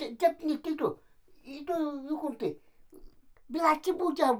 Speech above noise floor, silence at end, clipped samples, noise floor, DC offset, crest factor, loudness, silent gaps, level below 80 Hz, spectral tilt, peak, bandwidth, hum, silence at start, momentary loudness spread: 22 dB; 0 s; under 0.1%; -52 dBFS; under 0.1%; 22 dB; -31 LUFS; none; -62 dBFS; -5 dB/octave; -10 dBFS; 19.5 kHz; none; 0 s; 16 LU